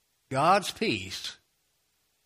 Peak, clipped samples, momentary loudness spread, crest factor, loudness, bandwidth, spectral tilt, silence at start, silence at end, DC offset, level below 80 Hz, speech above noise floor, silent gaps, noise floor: -10 dBFS; under 0.1%; 13 LU; 20 dB; -27 LUFS; 15.5 kHz; -4 dB/octave; 0.3 s; 0.9 s; under 0.1%; -66 dBFS; 46 dB; none; -73 dBFS